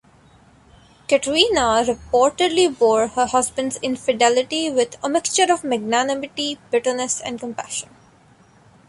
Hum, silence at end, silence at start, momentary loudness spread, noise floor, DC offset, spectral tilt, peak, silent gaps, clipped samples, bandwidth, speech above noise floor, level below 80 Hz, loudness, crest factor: none; 1.05 s; 1.1 s; 10 LU; -52 dBFS; under 0.1%; -2 dB/octave; -2 dBFS; none; under 0.1%; 11.5 kHz; 33 dB; -52 dBFS; -19 LUFS; 18 dB